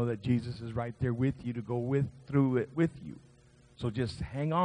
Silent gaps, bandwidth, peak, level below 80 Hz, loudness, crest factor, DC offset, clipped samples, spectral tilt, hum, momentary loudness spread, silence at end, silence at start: none; 10 kHz; -14 dBFS; -56 dBFS; -33 LUFS; 18 dB; under 0.1%; under 0.1%; -8.5 dB/octave; none; 9 LU; 0 s; 0 s